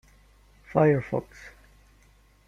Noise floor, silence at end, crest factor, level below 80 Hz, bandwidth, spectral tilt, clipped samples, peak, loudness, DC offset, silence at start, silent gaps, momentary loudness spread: -59 dBFS; 1 s; 22 dB; -56 dBFS; 7.4 kHz; -9 dB/octave; under 0.1%; -6 dBFS; -25 LUFS; under 0.1%; 0.7 s; none; 25 LU